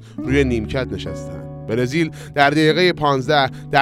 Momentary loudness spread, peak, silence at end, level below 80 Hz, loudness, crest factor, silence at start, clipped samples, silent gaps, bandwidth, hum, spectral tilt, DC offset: 14 LU; 0 dBFS; 0 s; -38 dBFS; -18 LUFS; 18 dB; 0 s; under 0.1%; none; 15 kHz; none; -6 dB/octave; under 0.1%